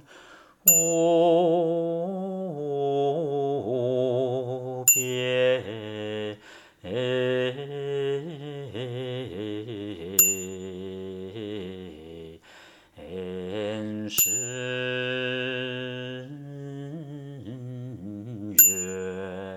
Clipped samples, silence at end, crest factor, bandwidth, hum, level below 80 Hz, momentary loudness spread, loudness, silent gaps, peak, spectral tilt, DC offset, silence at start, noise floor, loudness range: under 0.1%; 0 s; 24 dB; 19 kHz; none; -66 dBFS; 19 LU; -25 LUFS; none; -4 dBFS; -3 dB/octave; under 0.1%; 0.1 s; -52 dBFS; 8 LU